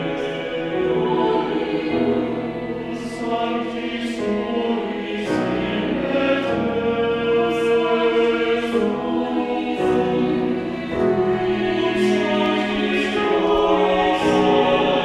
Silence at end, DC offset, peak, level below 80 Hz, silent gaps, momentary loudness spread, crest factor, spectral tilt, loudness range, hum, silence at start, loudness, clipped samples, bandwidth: 0 s; under 0.1%; -6 dBFS; -46 dBFS; none; 8 LU; 14 dB; -6 dB/octave; 5 LU; none; 0 s; -20 LUFS; under 0.1%; 12 kHz